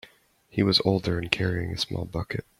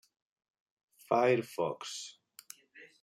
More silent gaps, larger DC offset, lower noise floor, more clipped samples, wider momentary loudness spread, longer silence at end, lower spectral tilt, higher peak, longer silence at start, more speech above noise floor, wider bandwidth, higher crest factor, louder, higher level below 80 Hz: neither; neither; about the same, -58 dBFS vs -59 dBFS; neither; second, 10 LU vs 24 LU; about the same, 0.2 s vs 0.15 s; about the same, -5.5 dB/octave vs -4.5 dB/octave; first, 0 dBFS vs -14 dBFS; second, 0.55 s vs 1.1 s; first, 32 dB vs 27 dB; second, 14 kHz vs 16 kHz; about the same, 26 dB vs 22 dB; first, -26 LUFS vs -32 LUFS; first, -50 dBFS vs -84 dBFS